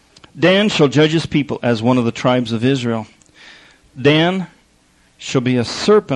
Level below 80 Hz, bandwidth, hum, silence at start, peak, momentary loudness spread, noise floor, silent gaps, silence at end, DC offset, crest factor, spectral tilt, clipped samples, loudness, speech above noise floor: -52 dBFS; 10.5 kHz; none; 0.35 s; -2 dBFS; 10 LU; -54 dBFS; none; 0 s; under 0.1%; 14 dB; -6 dB/octave; under 0.1%; -16 LUFS; 39 dB